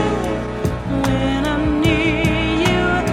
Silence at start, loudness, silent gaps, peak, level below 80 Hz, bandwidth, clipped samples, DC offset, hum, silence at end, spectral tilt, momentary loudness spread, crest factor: 0 s; -18 LUFS; none; -2 dBFS; -30 dBFS; 16.5 kHz; under 0.1%; under 0.1%; none; 0 s; -6 dB/octave; 6 LU; 14 dB